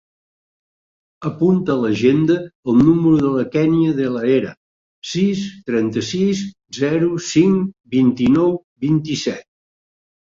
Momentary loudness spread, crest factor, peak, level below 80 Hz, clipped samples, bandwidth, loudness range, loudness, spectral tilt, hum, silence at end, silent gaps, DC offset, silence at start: 10 LU; 16 dB; -2 dBFS; -52 dBFS; under 0.1%; 7.6 kHz; 4 LU; -17 LUFS; -6.5 dB/octave; none; 0.85 s; 2.55-2.63 s, 4.57-5.02 s, 8.64-8.76 s; under 0.1%; 1.2 s